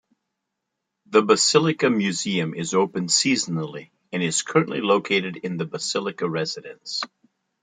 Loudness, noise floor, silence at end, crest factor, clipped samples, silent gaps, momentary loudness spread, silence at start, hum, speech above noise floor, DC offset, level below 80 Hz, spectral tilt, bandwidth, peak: -22 LUFS; -81 dBFS; 0.55 s; 20 dB; under 0.1%; none; 12 LU; 1.1 s; none; 58 dB; under 0.1%; -70 dBFS; -3.5 dB/octave; 9.6 kHz; -2 dBFS